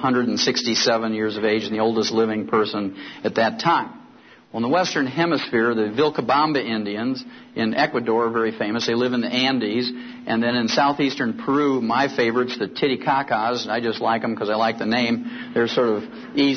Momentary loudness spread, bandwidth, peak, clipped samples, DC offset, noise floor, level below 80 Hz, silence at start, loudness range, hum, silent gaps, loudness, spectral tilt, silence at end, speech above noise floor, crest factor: 7 LU; 6.6 kHz; -6 dBFS; under 0.1%; under 0.1%; -48 dBFS; -66 dBFS; 0 s; 1 LU; none; none; -21 LUFS; -4.5 dB/octave; 0 s; 27 dB; 16 dB